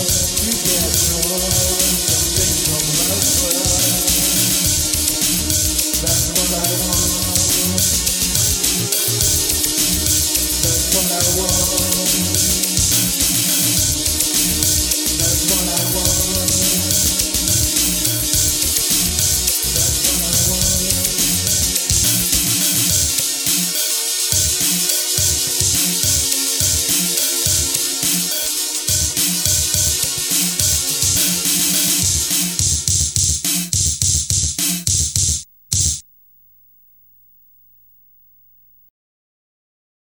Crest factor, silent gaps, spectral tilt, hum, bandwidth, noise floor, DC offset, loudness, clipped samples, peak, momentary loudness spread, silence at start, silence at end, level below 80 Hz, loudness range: 18 dB; none; -1.5 dB/octave; none; over 20 kHz; -51 dBFS; under 0.1%; -14 LUFS; under 0.1%; 0 dBFS; 2 LU; 0 s; 4.1 s; -32 dBFS; 1 LU